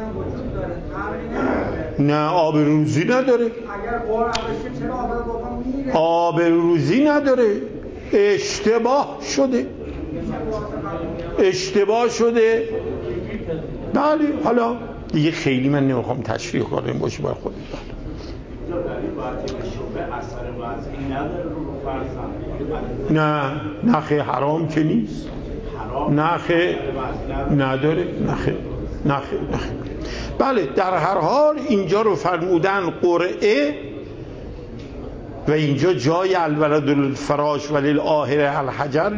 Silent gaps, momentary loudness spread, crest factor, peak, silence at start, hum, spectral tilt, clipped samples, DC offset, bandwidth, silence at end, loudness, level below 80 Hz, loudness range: none; 12 LU; 16 dB; -4 dBFS; 0 s; none; -6.5 dB/octave; under 0.1%; under 0.1%; 8 kHz; 0 s; -21 LUFS; -38 dBFS; 8 LU